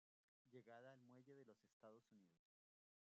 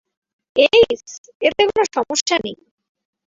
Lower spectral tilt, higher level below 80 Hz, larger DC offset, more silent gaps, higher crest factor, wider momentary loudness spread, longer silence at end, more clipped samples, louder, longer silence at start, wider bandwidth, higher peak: first, -5.5 dB/octave vs -2 dB/octave; second, under -90 dBFS vs -52 dBFS; neither; second, 1.73-1.80 s vs 1.18-1.24 s, 1.35-1.40 s, 2.21-2.26 s; about the same, 18 dB vs 18 dB; second, 5 LU vs 14 LU; about the same, 0.65 s vs 0.7 s; neither; second, -67 LUFS vs -17 LUFS; about the same, 0.45 s vs 0.55 s; about the same, 7.2 kHz vs 7.8 kHz; second, -52 dBFS vs -2 dBFS